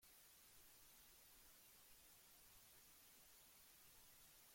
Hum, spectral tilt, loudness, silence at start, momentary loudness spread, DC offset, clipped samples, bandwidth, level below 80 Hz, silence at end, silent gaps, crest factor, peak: none; -0.5 dB/octave; -66 LUFS; 0 s; 0 LU; under 0.1%; under 0.1%; 16.5 kHz; -84 dBFS; 0 s; none; 14 dB; -54 dBFS